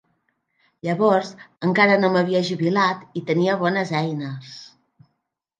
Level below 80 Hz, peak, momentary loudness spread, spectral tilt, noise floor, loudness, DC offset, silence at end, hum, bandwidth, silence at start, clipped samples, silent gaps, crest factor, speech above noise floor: -70 dBFS; -4 dBFS; 16 LU; -6.5 dB/octave; -76 dBFS; -20 LUFS; under 0.1%; 0.95 s; none; 9.2 kHz; 0.85 s; under 0.1%; none; 18 dB; 56 dB